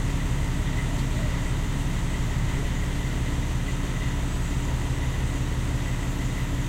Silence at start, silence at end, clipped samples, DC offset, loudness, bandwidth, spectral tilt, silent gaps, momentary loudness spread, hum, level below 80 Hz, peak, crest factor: 0 s; 0 s; under 0.1%; 0.2%; -28 LUFS; 16 kHz; -5.5 dB/octave; none; 1 LU; none; -28 dBFS; -14 dBFS; 12 dB